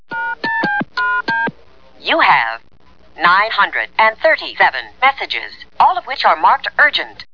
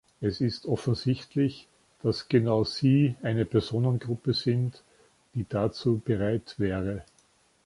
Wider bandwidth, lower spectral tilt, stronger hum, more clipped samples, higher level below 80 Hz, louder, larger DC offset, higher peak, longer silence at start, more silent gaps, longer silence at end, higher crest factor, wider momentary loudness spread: second, 5.4 kHz vs 11.5 kHz; second, -4.5 dB/octave vs -7.5 dB/octave; neither; neither; about the same, -54 dBFS vs -54 dBFS; first, -14 LUFS vs -28 LUFS; first, 0.8% vs under 0.1%; first, 0 dBFS vs -10 dBFS; about the same, 0.1 s vs 0.2 s; neither; second, 0.1 s vs 0.65 s; about the same, 16 dB vs 18 dB; about the same, 10 LU vs 8 LU